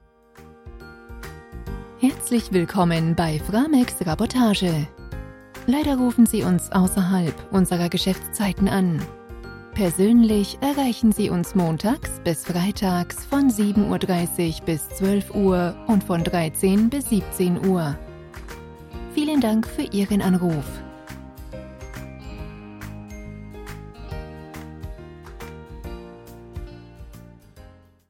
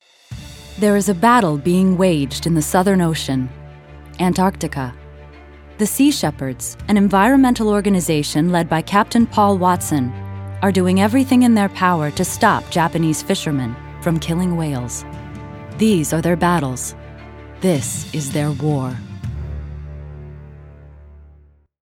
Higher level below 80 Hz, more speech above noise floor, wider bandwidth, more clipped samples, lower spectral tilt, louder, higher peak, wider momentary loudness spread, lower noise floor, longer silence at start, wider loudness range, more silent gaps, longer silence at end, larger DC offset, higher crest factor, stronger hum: about the same, -40 dBFS vs -40 dBFS; second, 28 dB vs 33 dB; about the same, 16.5 kHz vs 17.5 kHz; neither; about the same, -6 dB/octave vs -5.5 dB/octave; second, -21 LUFS vs -17 LUFS; second, -6 dBFS vs 0 dBFS; about the same, 20 LU vs 19 LU; about the same, -49 dBFS vs -49 dBFS; about the same, 0.4 s vs 0.3 s; first, 17 LU vs 7 LU; neither; second, 0.4 s vs 0.6 s; neither; about the same, 16 dB vs 18 dB; neither